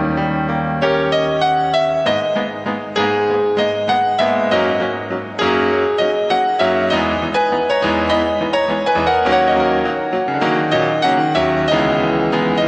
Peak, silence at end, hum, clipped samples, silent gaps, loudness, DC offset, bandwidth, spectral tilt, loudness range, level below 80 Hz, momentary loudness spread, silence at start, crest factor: -2 dBFS; 0 s; none; under 0.1%; none; -17 LUFS; under 0.1%; 8.8 kHz; -6 dB/octave; 1 LU; -44 dBFS; 4 LU; 0 s; 14 dB